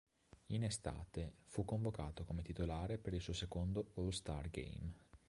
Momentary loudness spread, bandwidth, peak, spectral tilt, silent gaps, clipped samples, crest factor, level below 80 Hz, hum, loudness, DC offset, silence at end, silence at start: 6 LU; 11.5 kHz; -26 dBFS; -6 dB/octave; none; under 0.1%; 18 dB; -54 dBFS; none; -45 LUFS; under 0.1%; 0.1 s; 0.5 s